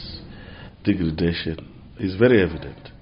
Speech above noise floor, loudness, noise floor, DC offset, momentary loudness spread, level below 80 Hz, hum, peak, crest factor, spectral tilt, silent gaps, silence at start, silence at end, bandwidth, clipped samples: 19 dB; -22 LUFS; -41 dBFS; under 0.1%; 24 LU; -42 dBFS; none; -4 dBFS; 20 dB; -5.5 dB/octave; none; 0 s; 0.1 s; 5.6 kHz; under 0.1%